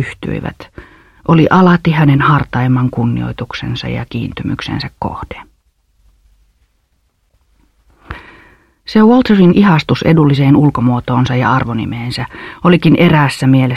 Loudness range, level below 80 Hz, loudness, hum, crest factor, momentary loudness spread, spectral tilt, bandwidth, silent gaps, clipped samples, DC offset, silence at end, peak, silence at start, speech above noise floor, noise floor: 14 LU; -38 dBFS; -12 LUFS; none; 12 dB; 16 LU; -8 dB/octave; 12.5 kHz; none; under 0.1%; under 0.1%; 0 s; 0 dBFS; 0 s; 48 dB; -60 dBFS